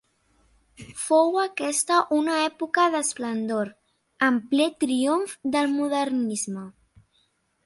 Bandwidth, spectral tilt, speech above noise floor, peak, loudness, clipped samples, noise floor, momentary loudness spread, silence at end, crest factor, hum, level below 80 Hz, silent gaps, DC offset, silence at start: 11.5 kHz; -3 dB/octave; 44 dB; -8 dBFS; -24 LUFS; under 0.1%; -68 dBFS; 9 LU; 0.95 s; 18 dB; none; -68 dBFS; none; under 0.1%; 0.8 s